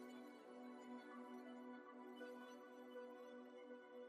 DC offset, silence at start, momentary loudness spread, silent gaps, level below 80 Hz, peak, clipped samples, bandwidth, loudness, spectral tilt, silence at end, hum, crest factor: under 0.1%; 0 s; 3 LU; none; under -90 dBFS; -44 dBFS; under 0.1%; 13 kHz; -58 LUFS; -4 dB/octave; 0 s; none; 14 dB